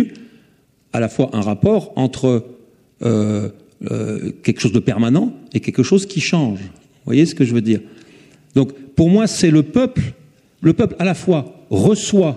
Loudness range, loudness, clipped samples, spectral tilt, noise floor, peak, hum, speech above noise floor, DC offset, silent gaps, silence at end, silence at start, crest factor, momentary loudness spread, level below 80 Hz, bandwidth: 3 LU; -17 LUFS; under 0.1%; -6.5 dB/octave; -56 dBFS; -2 dBFS; none; 40 dB; under 0.1%; none; 0 s; 0 s; 16 dB; 10 LU; -48 dBFS; 12 kHz